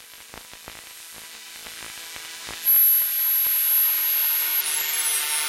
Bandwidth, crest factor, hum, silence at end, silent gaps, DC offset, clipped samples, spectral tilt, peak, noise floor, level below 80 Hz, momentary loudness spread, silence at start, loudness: 16.5 kHz; 14 dB; none; 0 s; none; under 0.1%; under 0.1%; 2.5 dB/octave; -10 dBFS; -43 dBFS; -64 dBFS; 23 LU; 0 s; -18 LUFS